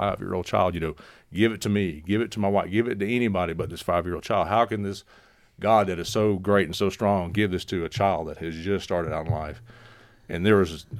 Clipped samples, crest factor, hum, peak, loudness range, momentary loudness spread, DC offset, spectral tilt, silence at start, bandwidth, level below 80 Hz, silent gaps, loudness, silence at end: under 0.1%; 20 dB; none; -6 dBFS; 3 LU; 10 LU; under 0.1%; -6 dB/octave; 0 s; 15.5 kHz; -48 dBFS; none; -25 LUFS; 0 s